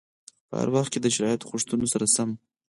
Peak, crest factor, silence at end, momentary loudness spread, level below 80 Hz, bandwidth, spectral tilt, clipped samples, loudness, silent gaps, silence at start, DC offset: -10 dBFS; 18 dB; 0.35 s; 8 LU; -62 dBFS; 11.5 kHz; -4 dB/octave; under 0.1%; -25 LUFS; none; 0.5 s; under 0.1%